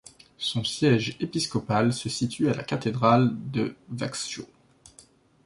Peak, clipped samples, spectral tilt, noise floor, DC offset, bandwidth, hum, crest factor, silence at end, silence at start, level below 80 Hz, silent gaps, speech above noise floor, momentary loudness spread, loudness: -6 dBFS; under 0.1%; -5.5 dB/octave; -56 dBFS; under 0.1%; 11.5 kHz; none; 20 dB; 1 s; 0.4 s; -60 dBFS; none; 31 dB; 11 LU; -26 LUFS